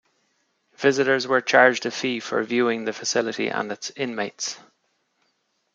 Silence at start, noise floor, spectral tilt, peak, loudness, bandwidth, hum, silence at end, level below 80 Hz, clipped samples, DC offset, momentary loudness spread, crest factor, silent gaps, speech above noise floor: 0.8 s; -71 dBFS; -3 dB/octave; -2 dBFS; -22 LUFS; 9.4 kHz; none; 1.15 s; -76 dBFS; under 0.1%; under 0.1%; 12 LU; 22 dB; none; 49 dB